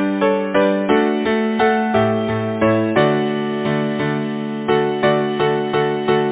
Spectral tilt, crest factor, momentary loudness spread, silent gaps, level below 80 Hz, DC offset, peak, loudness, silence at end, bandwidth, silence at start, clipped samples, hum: -10.5 dB/octave; 16 dB; 5 LU; none; -50 dBFS; under 0.1%; -2 dBFS; -18 LUFS; 0 s; 4 kHz; 0 s; under 0.1%; none